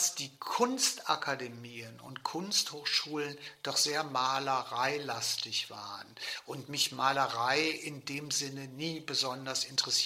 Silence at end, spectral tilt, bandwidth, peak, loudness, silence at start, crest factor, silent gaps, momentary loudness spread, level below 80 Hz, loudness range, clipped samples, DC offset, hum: 0 s; -1.5 dB/octave; 16 kHz; -12 dBFS; -32 LUFS; 0 s; 22 dB; none; 12 LU; -84 dBFS; 1 LU; under 0.1%; under 0.1%; none